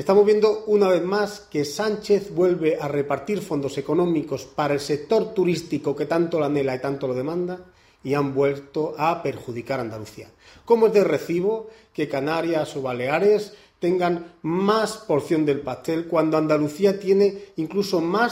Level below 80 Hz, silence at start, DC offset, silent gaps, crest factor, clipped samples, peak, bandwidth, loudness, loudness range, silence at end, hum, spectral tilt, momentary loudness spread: -60 dBFS; 0 s; under 0.1%; none; 18 dB; under 0.1%; -4 dBFS; 16 kHz; -23 LUFS; 3 LU; 0 s; none; -6 dB/octave; 9 LU